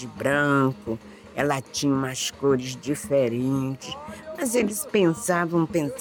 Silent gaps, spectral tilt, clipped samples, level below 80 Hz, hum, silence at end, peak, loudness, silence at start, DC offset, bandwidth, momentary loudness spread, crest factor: none; -5 dB/octave; under 0.1%; -56 dBFS; none; 0 s; -8 dBFS; -24 LUFS; 0 s; under 0.1%; 19 kHz; 12 LU; 16 dB